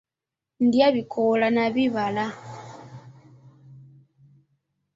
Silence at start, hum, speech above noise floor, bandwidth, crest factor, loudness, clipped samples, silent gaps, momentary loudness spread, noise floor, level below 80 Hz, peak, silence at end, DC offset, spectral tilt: 0.6 s; none; 66 dB; 7.6 kHz; 18 dB; -22 LUFS; under 0.1%; none; 22 LU; -88 dBFS; -66 dBFS; -6 dBFS; 1.15 s; under 0.1%; -6.5 dB/octave